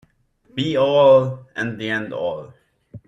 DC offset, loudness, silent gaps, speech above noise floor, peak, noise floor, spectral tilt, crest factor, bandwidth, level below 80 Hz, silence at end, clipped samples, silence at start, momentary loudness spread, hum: under 0.1%; -19 LUFS; none; 40 dB; -4 dBFS; -58 dBFS; -6.5 dB/octave; 16 dB; 7.8 kHz; -60 dBFS; 0.1 s; under 0.1%; 0.55 s; 14 LU; none